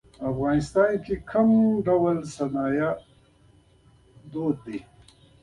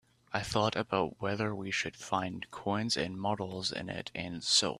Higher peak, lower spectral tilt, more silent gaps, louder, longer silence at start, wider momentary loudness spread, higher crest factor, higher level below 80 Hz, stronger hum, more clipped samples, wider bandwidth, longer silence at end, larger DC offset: first, -8 dBFS vs -12 dBFS; first, -7.5 dB/octave vs -3.5 dB/octave; neither; first, -24 LUFS vs -33 LUFS; about the same, 0.2 s vs 0.3 s; first, 13 LU vs 8 LU; second, 16 dB vs 22 dB; first, -52 dBFS vs -62 dBFS; neither; neither; second, 11 kHz vs 14 kHz; first, 0.6 s vs 0 s; neither